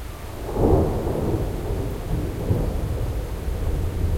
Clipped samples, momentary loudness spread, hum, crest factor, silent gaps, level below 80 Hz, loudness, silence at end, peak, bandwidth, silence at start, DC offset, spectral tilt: under 0.1%; 9 LU; none; 18 dB; none; -28 dBFS; -25 LUFS; 0 s; -4 dBFS; 16.5 kHz; 0 s; under 0.1%; -8 dB/octave